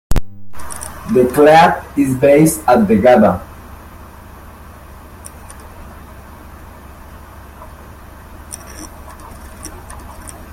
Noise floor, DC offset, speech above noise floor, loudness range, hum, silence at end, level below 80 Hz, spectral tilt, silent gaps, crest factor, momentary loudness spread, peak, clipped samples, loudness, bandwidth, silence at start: -36 dBFS; under 0.1%; 26 dB; 25 LU; none; 0.05 s; -32 dBFS; -5.5 dB/octave; none; 16 dB; 27 LU; 0 dBFS; under 0.1%; -12 LUFS; 16.5 kHz; 0.1 s